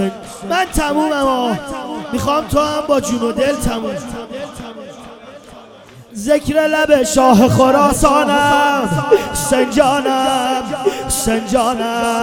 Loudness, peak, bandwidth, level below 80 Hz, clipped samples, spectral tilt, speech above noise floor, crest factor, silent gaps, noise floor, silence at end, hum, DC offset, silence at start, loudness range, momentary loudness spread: -15 LUFS; 0 dBFS; 19.5 kHz; -34 dBFS; under 0.1%; -4.5 dB/octave; 25 dB; 16 dB; none; -39 dBFS; 0 s; none; under 0.1%; 0 s; 9 LU; 16 LU